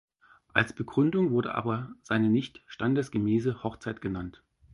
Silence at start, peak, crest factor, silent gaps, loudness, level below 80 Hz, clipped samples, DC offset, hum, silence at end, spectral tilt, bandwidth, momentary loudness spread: 0.55 s; -4 dBFS; 24 dB; none; -29 LUFS; -58 dBFS; under 0.1%; under 0.1%; none; 0.45 s; -7.5 dB/octave; 11.5 kHz; 10 LU